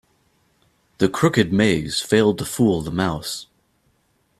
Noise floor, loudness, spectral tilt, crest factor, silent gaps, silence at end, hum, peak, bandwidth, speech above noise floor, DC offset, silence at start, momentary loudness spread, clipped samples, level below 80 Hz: -65 dBFS; -20 LUFS; -5 dB/octave; 20 dB; none; 0.95 s; none; -2 dBFS; 15 kHz; 46 dB; under 0.1%; 1 s; 8 LU; under 0.1%; -50 dBFS